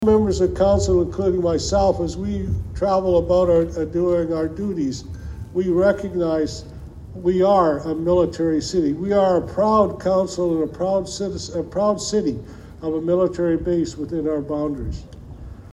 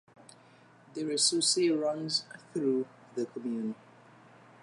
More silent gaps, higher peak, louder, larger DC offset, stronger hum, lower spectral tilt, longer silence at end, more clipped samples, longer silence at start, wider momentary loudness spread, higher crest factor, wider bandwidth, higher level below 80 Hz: neither; first, -4 dBFS vs -12 dBFS; first, -20 LUFS vs -30 LUFS; neither; neither; first, -6.5 dB/octave vs -2.5 dB/octave; second, 0.05 s vs 0.9 s; neither; second, 0 s vs 0.9 s; about the same, 13 LU vs 14 LU; about the same, 16 dB vs 20 dB; about the same, 11 kHz vs 11.5 kHz; first, -36 dBFS vs -84 dBFS